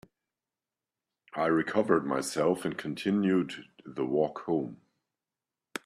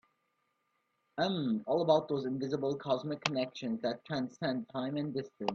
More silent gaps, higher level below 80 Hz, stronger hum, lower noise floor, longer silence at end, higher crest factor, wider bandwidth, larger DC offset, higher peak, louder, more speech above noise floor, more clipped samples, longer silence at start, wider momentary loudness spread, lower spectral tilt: neither; about the same, -72 dBFS vs -76 dBFS; neither; first, under -90 dBFS vs -79 dBFS; about the same, 0.05 s vs 0 s; about the same, 20 dB vs 22 dB; first, 14 kHz vs 8 kHz; neither; first, -10 dBFS vs -14 dBFS; first, -29 LUFS vs -34 LUFS; first, over 61 dB vs 46 dB; neither; first, 1.35 s vs 1.15 s; first, 15 LU vs 8 LU; about the same, -5.5 dB/octave vs -6 dB/octave